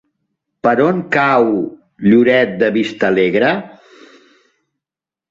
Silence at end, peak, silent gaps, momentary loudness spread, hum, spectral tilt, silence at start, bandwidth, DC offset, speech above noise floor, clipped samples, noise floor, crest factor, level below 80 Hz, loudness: 1.6 s; -2 dBFS; none; 8 LU; none; -7 dB/octave; 0.65 s; 7.6 kHz; under 0.1%; 75 dB; under 0.1%; -88 dBFS; 14 dB; -56 dBFS; -14 LUFS